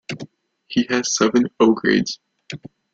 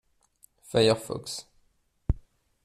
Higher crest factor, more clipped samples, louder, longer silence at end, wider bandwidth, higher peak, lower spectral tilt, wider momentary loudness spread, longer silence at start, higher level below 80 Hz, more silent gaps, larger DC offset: about the same, 18 dB vs 22 dB; neither; first, -19 LUFS vs -28 LUFS; about the same, 0.35 s vs 0.45 s; second, 7.8 kHz vs 14.5 kHz; first, -2 dBFS vs -10 dBFS; about the same, -4 dB/octave vs -5 dB/octave; first, 19 LU vs 15 LU; second, 0.1 s vs 0.7 s; second, -58 dBFS vs -42 dBFS; neither; neither